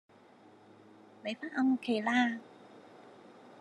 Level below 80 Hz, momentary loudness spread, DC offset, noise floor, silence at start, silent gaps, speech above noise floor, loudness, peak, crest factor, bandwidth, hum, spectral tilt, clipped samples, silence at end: under -90 dBFS; 25 LU; under 0.1%; -59 dBFS; 1.25 s; none; 28 dB; -32 LUFS; -16 dBFS; 20 dB; 10.5 kHz; none; -4.5 dB/octave; under 0.1%; 0 s